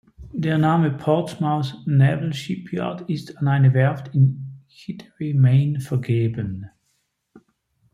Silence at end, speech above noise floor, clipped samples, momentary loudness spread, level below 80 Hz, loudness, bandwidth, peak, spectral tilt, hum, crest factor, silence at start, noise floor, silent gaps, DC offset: 0.55 s; 51 dB; under 0.1%; 17 LU; -56 dBFS; -21 LUFS; 11 kHz; -6 dBFS; -8.5 dB/octave; none; 16 dB; 0.2 s; -70 dBFS; none; under 0.1%